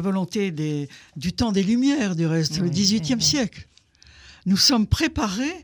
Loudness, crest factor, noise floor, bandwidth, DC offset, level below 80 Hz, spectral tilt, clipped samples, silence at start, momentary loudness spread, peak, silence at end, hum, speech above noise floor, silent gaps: -22 LUFS; 18 dB; -52 dBFS; 19 kHz; under 0.1%; -42 dBFS; -4 dB/octave; under 0.1%; 0 s; 12 LU; -4 dBFS; 0 s; none; 30 dB; none